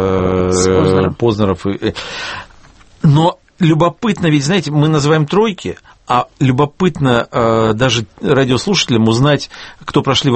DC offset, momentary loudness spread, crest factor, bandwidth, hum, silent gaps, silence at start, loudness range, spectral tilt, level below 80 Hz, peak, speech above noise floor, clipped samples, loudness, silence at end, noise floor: under 0.1%; 9 LU; 14 dB; 8.8 kHz; none; none; 0 s; 2 LU; -5.5 dB/octave; -40 dBFS; 0 dBFS; 29 dB; under 0.1%; -14 LUFS; 0 s; -42 dBFS